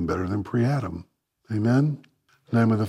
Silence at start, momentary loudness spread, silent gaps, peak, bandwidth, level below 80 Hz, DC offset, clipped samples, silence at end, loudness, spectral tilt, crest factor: 0 s; 13 LU; none; -10 dBFS; 11 kHz; -52 dBFS; under 0.1%; under 0.1%; 0 s; -25 LUFS; -8.5 dB/octave; 14 dB